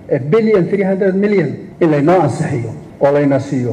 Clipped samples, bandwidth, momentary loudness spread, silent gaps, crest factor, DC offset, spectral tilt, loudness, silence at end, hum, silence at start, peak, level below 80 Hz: under 0.1%; 10 kHz; 8 LU; none; 12 dB; under 0.1%; -8 dB/octave; -14 LUFS; 0 s; none; 0 s; -2 dBFS; -50 dBFS